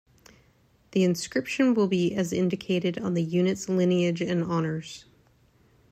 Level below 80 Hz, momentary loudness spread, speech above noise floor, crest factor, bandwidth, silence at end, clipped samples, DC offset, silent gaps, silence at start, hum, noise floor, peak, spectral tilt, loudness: -64 dBFS; 7 LU; 37 dB; 16 dB; 14.5 kHz; 0.9 s; under 0.1%; under 0.1%; none; 0.95 s; none; -62 dBFS; -12 dBFS; -6 dB/octave; -26 LUFS